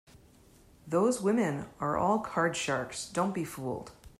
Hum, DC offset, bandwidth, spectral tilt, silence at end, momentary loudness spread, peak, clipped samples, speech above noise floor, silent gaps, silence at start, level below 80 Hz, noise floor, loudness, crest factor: none; under 0.1%; 15.5 kHz; -5 dB/octave; 0.1 s; 10 LU; -14 dBFS; under 0.1%; 28 dB; none; 0.85 s; -62 dBFS; -59 dBFS; -31 LUFS; 16 dB